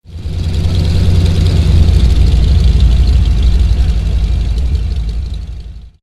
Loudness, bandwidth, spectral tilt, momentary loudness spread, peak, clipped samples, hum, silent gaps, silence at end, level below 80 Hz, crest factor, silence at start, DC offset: -13 LUFS; 10.5 kHz; -7 dB/octave; 12 LU; 0 dBFS; 0.2%; none; none; 0.15 s; -12 dBFS; 10 dB; 0.1 s; under 0.1%